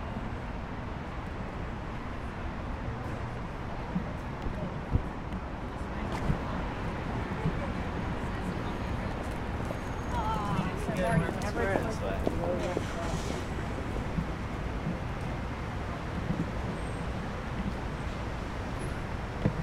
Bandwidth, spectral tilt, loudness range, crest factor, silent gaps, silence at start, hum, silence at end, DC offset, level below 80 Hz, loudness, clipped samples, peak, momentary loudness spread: 15.5 kHz; -6.5 dB/octave; 6 LU; 22 dB; none; 0 s; none; 0 s; under 0.1%; -40 dBFS; -35 LUFS; under 0.1%; -10 dBFS; 7 LU